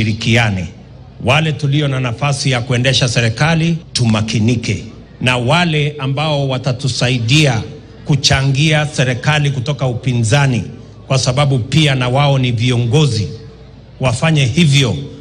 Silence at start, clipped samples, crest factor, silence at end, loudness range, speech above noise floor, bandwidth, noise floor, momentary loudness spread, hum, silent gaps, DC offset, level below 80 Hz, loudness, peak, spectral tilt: 0 s; under 0.1%; 14 dB; 0 s; 1 LU; 23 dB; 10.5 kHz; -37 dBFS; 8 LU; none; none; under 0.1%; -38 dBFS; -14 LUFS; 0 dBFS; -5 dB/octave